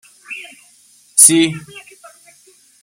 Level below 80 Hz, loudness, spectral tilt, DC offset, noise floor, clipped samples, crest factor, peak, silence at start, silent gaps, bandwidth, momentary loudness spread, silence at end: -64 dBFS; -10 LUFS; -2 dB/octave; under 0.1%; -50 dBFS; 0.2%; 18 dB; 0 dBFS; 0.3 s; none; 16.5 kHz; 23 LU; 1.05 s